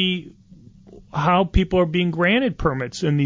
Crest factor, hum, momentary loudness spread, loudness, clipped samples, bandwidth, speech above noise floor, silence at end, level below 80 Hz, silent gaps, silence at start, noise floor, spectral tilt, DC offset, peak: 16 dB; none; 6 LU; -20 LUFS; under 0.1%; 7.6 kHz; 27 dB; 0 s; -32 dBFS; none; 0 s; -47 dBFS; -6.5 dB/octave; under 0.1%; -6 dBFS